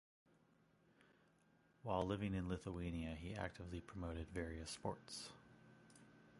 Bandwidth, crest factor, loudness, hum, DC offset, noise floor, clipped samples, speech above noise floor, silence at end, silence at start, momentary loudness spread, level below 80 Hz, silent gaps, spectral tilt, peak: 11.5 kHz; 24 dB; -47 LUFS; none; under 0.1%; -75 dBFS; under 0.1%; 29 dB; 0 s; 1 s; 23 LU; -60 dBFS; none; -6 dB/octave; -26 dBFS